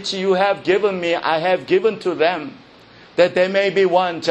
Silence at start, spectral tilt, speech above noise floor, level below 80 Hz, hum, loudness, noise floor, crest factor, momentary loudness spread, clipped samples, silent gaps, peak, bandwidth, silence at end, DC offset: 0 s; -5 dB/octave; 28 dB; -62 dBFS; none; -18 LUFS; -45 dBFS; 18 dB; 4 LU; under 0.1%; none; 0 dBFS; 8.8 kHz; 0 s; under 0.1%